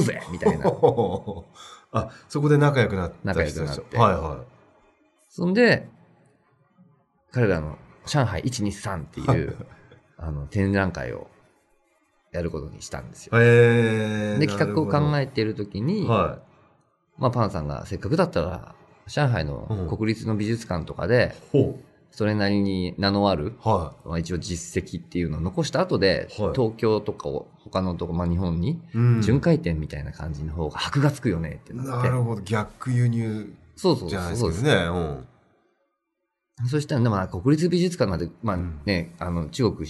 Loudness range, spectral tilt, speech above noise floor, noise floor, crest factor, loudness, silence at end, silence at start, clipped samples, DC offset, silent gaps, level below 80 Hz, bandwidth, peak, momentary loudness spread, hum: 5 LU; -6.5 dB/octave; 56 dB; -79 dBFS; 20 dB; -24 LUFS; 0 s; 0 s; under 0.1%; under 0.1%; none; -44 dBFS; 12 kHz; -4 dBFS; 12 LU; none